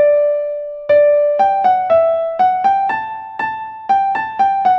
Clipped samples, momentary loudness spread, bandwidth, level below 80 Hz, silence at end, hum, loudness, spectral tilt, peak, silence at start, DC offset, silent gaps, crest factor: under 0.1%; 10 LU; 6 kHz; -56 dBFS; 0 s; none; -15 LUFS; -5.5 dB/octave; -2 dBFS; 0 s; under 0.1%; none; 12 dB